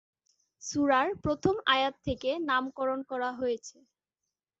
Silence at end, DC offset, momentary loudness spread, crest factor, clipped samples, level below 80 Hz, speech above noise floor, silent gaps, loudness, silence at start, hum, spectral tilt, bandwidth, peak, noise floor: 0.9 s; under 0.1%; 9 LU; 20 dB; under 0.1%; -56 dBFS; 59 dB; none; -30 LUFS; 0.6 s; none; -4 dB/octave; 8 kHz; -10 dBFS; -88 dBFS